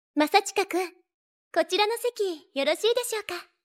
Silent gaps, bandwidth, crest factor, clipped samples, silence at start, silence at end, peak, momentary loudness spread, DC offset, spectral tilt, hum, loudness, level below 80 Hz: 1.14-1.51 s; 16.5 kHz; 20 dB; under 0.1%; 0.15 s; 0.2 s; -8 dBFS; 9 LU; under 0.1%; -0.5 dB/octave; none; -26 LUFS; -82 dBFS